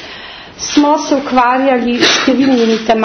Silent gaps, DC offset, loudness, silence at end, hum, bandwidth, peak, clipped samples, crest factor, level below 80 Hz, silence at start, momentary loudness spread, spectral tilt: none; under 0.1%; -11 LUFS; 0 s; none; 6.6 kHz; 0 dBFS; under 0.1%; 12 dB; -46 dBFS; 0 s; 15 LU; -3 dB/octave